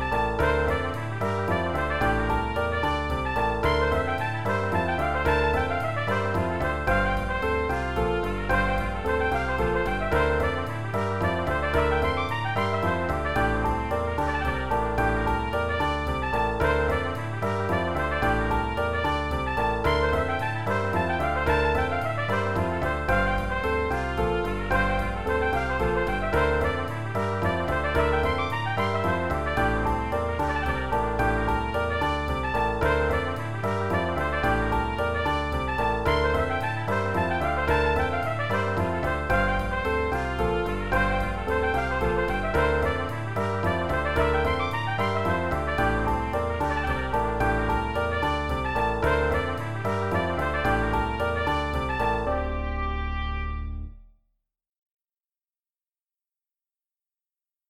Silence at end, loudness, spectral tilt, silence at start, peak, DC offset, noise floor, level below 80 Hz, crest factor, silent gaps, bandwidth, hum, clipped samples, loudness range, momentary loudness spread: 0 s; -26 LUFS; -6.5 dB/octave; 0 s; -10 dBFS; 0.8%; under -90 dBFS; -34 dBFS; 16 dB; 54.78-54.83 s, 54.91-54.97 s; 15 kHz; none; under 0.1%; 1 LU; 4 LU